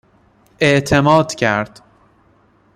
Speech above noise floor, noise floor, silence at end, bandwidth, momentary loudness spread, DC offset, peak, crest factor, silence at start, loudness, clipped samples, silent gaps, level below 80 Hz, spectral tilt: 40 dB; -54 dBFS; 1.1 s; 14.5 kHz; 8 LU; under 0.1%; -2 dBFS; 16 dB; 0.6 s; -15 LUFS; under 0.1%; none; -46 dBFS; -5.5 dB/octave